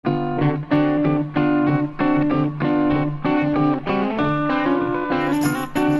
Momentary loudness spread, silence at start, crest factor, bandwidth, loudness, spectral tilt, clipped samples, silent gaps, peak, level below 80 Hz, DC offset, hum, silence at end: 3 LU; 0.05 s; 14 dB; 12.5 kHz; -20 LUFS; -7.5 dB/octave; under 0.1%; none; -6 dBFS; -46 dBFS; under 0.1%; none; 0 s